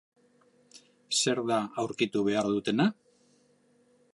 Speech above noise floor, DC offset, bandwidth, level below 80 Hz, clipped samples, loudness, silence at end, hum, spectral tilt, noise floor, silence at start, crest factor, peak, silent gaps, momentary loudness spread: 38 dB; under 0.1%; 11.5 kHz; -72 dBFS; under 0.1%; -29 LUFS; 1.2 s; none; -4 dB/octave; -66 dBFS; 0.75 s; 18 dB; -12 dBFS; none; 4 LU